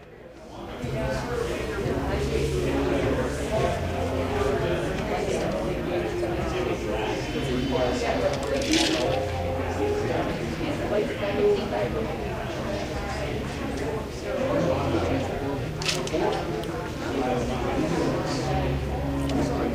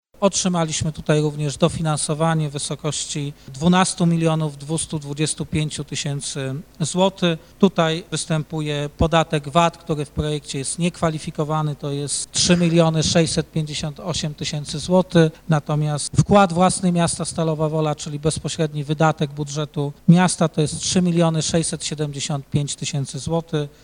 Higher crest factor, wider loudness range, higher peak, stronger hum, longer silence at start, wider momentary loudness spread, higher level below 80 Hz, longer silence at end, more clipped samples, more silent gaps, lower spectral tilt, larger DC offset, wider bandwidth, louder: about the same, 18 dB vs 20 dB; about the same, 2 LU vs 3 LU; second, -8 dBFS vs 0 dBFS; neither; second, 0 s vs 0.2 s; second, 6 LU vs 9 LU; first, -38 dBFS vs -44 dBFS; second, 0 s vs 0.15 s; neither; neither; about the same, -5.5 dB/octave vs -5 dB/octave; neither; first, 15.5 kHz vs 10.5 kHz; second, -27 LUFS vs -21 LUFS